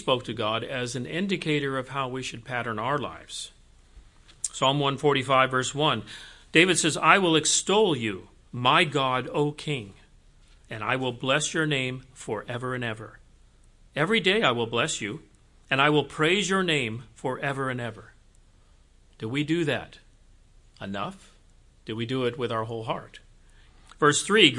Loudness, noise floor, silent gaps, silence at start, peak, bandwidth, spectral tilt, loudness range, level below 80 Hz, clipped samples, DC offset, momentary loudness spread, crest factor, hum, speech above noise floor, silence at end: -25 LUFS; -57 dBFS; none; 0 s; -2 dBFS; 11.5 kHz; -3.5 dB/octave; 11 LU; -56 dBFS; under 0.1%; under 0.1%; 16 LU; 24 dB; none; 31 dB; 0 s